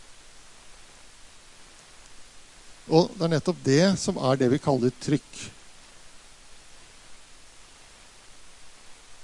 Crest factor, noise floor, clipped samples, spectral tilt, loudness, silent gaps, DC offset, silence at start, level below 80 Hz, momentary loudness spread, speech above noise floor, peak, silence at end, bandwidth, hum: 22 dB; -50 dBFS; under 0.1%; -5.5 dB/octave; -24 LUFS; none; under 0.1%; 0.1 s; -56 dBFS; 20 LU; 27 dB; -6 dBFS; 0 s; 11.5 kHz; none